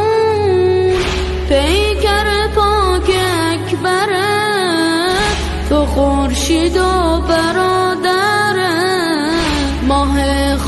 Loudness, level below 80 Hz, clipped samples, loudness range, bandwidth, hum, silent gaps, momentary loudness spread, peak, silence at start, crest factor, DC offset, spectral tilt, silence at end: -14 LUFS; -22 dBFS; under 0.1%; 1 LU; 12.5 kHz; none; none; 3 LU; -2 dBFS; 0 s; 12 dB; under 0.1%; -4.5 dB/octave; 0 s